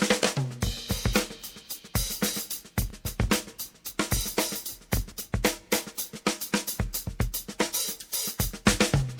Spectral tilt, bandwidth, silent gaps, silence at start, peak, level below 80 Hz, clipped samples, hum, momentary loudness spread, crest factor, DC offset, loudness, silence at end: -3.5 dB/octave; over 20 kHz; none; 0 s; -6 dBFS; -38 dBFS; under 0.1%; none; 9 LU; 24 dB; under 0.1%; -29 LUFS; 0 s